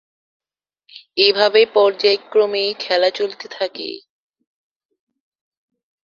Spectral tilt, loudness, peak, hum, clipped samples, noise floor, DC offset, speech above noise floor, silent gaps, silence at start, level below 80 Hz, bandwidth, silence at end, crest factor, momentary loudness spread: -3 dB/octave; -17 LUFS; 0 dBFS; none; under 0.1%; -61 dBFS; under 0.1%; 44 dB; none; 1.15 s; -70 dBFS; 7.2 kHz; 2.05 s; 20 dB; 14 LU